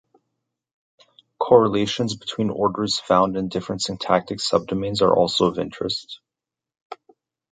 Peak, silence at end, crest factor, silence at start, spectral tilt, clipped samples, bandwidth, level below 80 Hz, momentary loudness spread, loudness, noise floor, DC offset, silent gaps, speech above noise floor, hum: 0 dBFS; 0.6 s; 22 dB; 1.4 s; -5 dB/octave; under 0.1%; 9.4 kHz; -54 dBFS; 19 LU; -21 LUFS; -88 dBFS; under 0.1%; 6.81-6.90 s; 67 dB; none